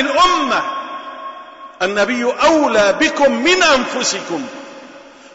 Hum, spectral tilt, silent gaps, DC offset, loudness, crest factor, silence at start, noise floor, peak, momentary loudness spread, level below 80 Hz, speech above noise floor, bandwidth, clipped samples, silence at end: none; -2 dB/octave; none; under 0.1%; -14 LUFS; 14 dB; 0 s; -39 dBFS; -4 dBFS; 18 LU; -48 dBFS; 24 dB; 8 kHz; under 0.1%; 0.25 s